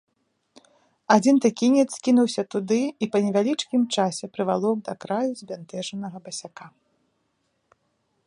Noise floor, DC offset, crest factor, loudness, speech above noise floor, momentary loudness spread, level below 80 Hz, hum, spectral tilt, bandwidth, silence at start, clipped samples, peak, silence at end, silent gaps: -72 dBFS; under 0.1%; 22 dB; -23 LUFS; 50 dB; 15 LU; -74 dBFS; none; -5 dB/octave; 11 kHz; 1.1 s; under 0.1%; -4 dBFS; 1.6 s; none